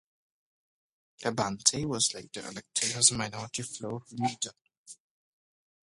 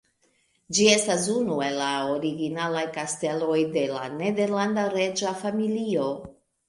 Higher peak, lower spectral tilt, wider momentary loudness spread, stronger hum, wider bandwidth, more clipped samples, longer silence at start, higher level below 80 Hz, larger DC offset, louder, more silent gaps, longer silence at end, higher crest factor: about the same, -6 dBFS vs -6 dBFS; second, -2 dB/octave vs -3.5 dB/octave; first, 15 LU vs 8 LU; neither; about the same, 11.5 kHz vs 11.5 kHz; neither; first, 1.2 s vs 0.7 s; about the same, -66 dBFS vs -66 dBFS; neither; second, -29 LUFS vs -25 LUFS; first, 4.77-4.85 s vs none; first, 1 s vs 0.4 s; first, 28 dB vs 20 dB